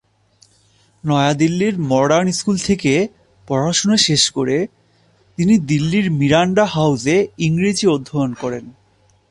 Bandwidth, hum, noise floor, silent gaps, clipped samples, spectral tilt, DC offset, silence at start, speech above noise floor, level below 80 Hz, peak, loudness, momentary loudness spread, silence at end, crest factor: 11.5 kHz; none; -56 dBFS; none; under 0.1%; -5 dB/octave; under 0.1%; 1.05 s; 40 dB; -50 dBFS; -2 dBFS; -16 LUFS; 9 LU; 0.6 s; 16 dB